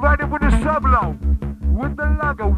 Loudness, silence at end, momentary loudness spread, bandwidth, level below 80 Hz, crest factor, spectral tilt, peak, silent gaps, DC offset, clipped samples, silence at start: -19 LUFS; 0 s; 6 LU; 9.4 kHz; -20 dBFS; 16 dB; -8 dB/octave; -2 dBFS; none; under 0.1%; under 0.1%; 0 s